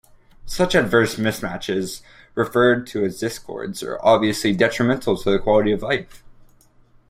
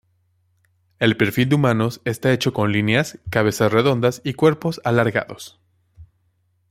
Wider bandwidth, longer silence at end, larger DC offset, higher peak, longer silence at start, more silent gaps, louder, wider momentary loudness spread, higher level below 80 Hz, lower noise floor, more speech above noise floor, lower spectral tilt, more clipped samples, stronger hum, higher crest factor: about the same, 16 kHz vs 16 kHz; first, 0.8 s vs 0.65 s; neither; about the same, -2 dBFS vs -2 dBFS; second, 0.45 s vs 1 s; neither; about the same, -20 LUFS vs -19 LUFS; first, 13 LU vs 6 LU; first, -44 dBFS vs -54 dBFS; second, -53 dBFS vs -65 dBFS; second, 33 dB vs 47 dB; about the same, -5 dB/octave vs -6 dB/octave; neither; neither; about the same, 18 dB vs 18 dB